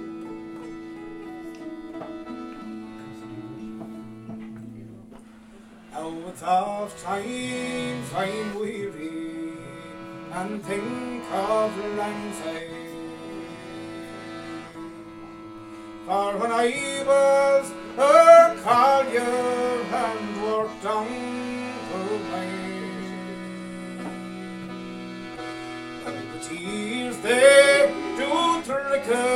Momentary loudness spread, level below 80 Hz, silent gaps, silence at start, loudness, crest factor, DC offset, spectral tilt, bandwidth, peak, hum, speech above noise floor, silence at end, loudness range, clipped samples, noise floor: 21 LU; -60 dBFS; none; 0 s; -23 LUFS; 22 dB; under 0.1%; -4 dB/octave; 14.5 kHz; -2 dBFS; none; 26 dB; 0 s; 19 LU; under 0.1%; -47 dBFS